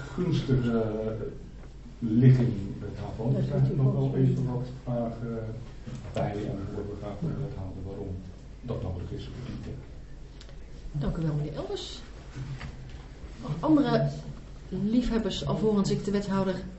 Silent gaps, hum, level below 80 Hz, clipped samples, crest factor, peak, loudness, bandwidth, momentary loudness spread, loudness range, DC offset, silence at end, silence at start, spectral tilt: none; none; -44 dBFS; under 0.1%; 20 dB; -8 dBFS; -29 LUFS; 8 kHz; 20 LU; 10 LU; under 0.1%; 0 s; 0 s; -8 dB/octave